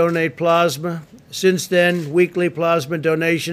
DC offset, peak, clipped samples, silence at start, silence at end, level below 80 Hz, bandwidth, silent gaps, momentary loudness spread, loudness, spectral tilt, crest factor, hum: under 0.1%; -4 dBFS; under 0.1%; 0 s; 0 s; -62 dBFS; 16 kHz; none; 9 LU; -18 LUFS; -5 dB/octave; 14 dB; none